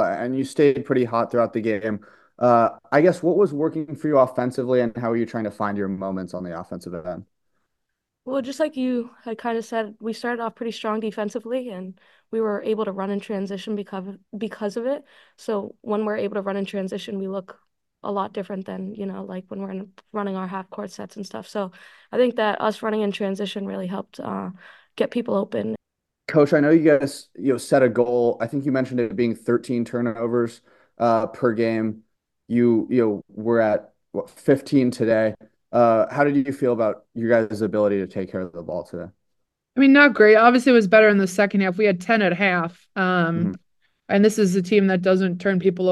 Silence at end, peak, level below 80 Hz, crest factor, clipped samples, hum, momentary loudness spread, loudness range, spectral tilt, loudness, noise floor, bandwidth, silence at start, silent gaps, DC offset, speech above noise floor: 0 s; 0 dBFS; -68 dBFS; 20 dB; under 0.1%; none; 15 LU; 12 LU; -6.5 dB/octave; -22 LUFS; -80 dBFS; 12.5 kHz; 0 s; none; under 0.1%; 58 dB